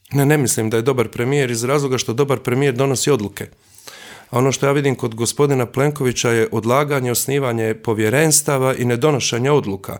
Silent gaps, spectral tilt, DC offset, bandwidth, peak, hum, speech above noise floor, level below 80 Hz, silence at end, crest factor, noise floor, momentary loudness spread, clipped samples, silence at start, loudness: none; -4.5 dB/octave; under 0.1%; 20 kHz; -2 dBFS; none; 22 dB; -56 dBFS; 0 s; 16 dB; -39 dBFS; 5 LU; under 0.1%; 0.1 s; -17 LUFS